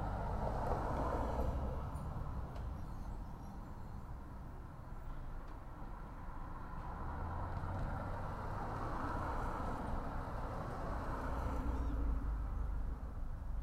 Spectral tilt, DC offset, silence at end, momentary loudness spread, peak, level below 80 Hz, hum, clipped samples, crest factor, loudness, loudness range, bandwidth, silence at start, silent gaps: -8 dB/octave; under 0.1%; 0 s; 12 LU; -24 dBFS; -44 dBFS; none; under 0.1%; 16 dB; -44 LUFS; 8 LU; 13.5 kHz; 0 s; none